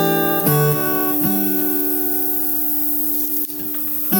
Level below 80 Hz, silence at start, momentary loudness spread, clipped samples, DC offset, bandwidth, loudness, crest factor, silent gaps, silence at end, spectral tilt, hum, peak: -64 dBFS; 0 s; 3 LU; under 0.1%; under 0.1%; over 20 kHz; -16 LUFS; 16 dB; none; 0 s; -5 dB/octave; none; -2 dBFS